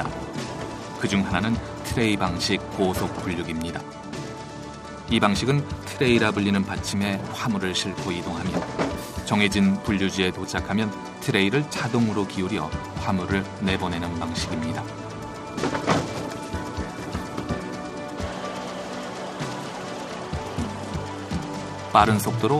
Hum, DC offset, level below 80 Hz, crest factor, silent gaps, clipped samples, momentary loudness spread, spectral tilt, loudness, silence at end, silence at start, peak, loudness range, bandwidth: none; under 0.1%; -44 dBFS; 24 dB; none; under 0.1%; 12 LU; -5 dB/octave; -26 LUFS; 0 s; 0 s; -2 dBFS; 8 LU; 15 kHz